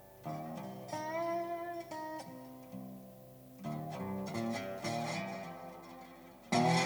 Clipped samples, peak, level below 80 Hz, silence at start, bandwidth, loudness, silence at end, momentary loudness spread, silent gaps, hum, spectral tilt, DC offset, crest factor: under 0.1%; -18 dBFS; -72 dBFS; 0 s; over 20 kHz; -40 LUFS; 0 s; 15 LU; none; 50 Hz at -65 dBFS; -5 dB/octave; under 0.1%; 22 dB